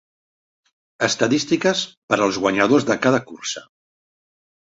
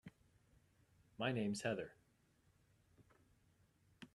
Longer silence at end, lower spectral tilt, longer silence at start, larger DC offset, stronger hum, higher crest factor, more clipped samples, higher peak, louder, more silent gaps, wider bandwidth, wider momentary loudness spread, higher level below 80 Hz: first, 1.05 s vs 0.1 s; about the same, -4 dB/octave vs -5 dB/octave; first, 1 s vs 0.05 s; neither; neither; about the same, 20 dB vs 22 dB; neither; first, -2 dBFS vs -26 dBFS; first, -19 LUFS vs -43 LUFS; first, 1.97-2.08 s vs none; second, 8 kHz vs 13 kHz; second, 11 LU vs 21 LU; first, -60 dBFS vs -80 dBFS